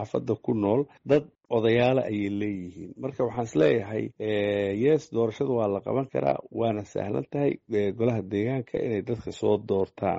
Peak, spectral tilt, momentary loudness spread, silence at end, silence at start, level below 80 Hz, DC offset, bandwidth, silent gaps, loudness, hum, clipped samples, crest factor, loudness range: -10 dBFS; -6.5 dB/octave; 7 LU; 0 s; 0 s; -60 dBFS; under 0.1%; 7.8 kHz; none; -27 LUFS; none; under 0.1%; 16 dB; 2 LU